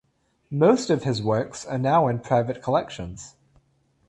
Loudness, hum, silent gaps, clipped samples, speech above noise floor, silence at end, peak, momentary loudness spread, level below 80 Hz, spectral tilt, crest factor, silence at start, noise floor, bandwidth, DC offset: -23 LUFS; none; none; under 0.1%; 42 dB; 0.8 s; -4 dBFS; 16 LU; -54 dBFS; -6.5 dB/octave; 20 dB; 0.5 s; -65 dBFS; 11.5 kHz; under 0.1%